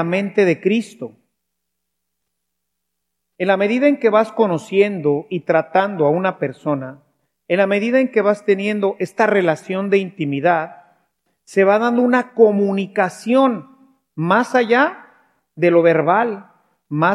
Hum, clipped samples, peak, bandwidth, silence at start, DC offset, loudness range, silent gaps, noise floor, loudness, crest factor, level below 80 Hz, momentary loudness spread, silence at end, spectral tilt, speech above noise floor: none; under 0.1%; 0 dBFS; 12 kHz; 0 s; under 0.1%; 4 LU; none; -78 dBFS; -17 LUFS; 18 dB; -76 dBFS; 9 LU; 0 s; -7 dB/octave; 61 dB